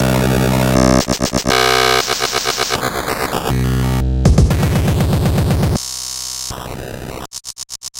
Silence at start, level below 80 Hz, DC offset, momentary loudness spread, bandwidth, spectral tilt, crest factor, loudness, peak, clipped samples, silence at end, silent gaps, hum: 0 s; -24 dBFS; under 0.1%; 15 LU; 17 kHz; -4.5 dB/octave; 16 dB; -15 LUFS; 0 dBFS; under 0.1%; 0 s; none; none